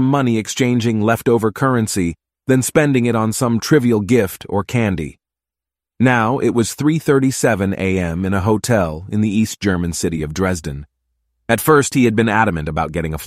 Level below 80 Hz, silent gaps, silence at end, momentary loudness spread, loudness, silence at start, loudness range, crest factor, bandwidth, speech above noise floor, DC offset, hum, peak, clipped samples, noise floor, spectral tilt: -40 dBFS; none; 0 s; 7 LU; -17 LUFS; 0 s; 2 LU; 16 dB; 16 kHz; 72 dB; under 0.1%; none; -2 dBFS; under 0.1%; -88 dBFS; -5.5 dB/octave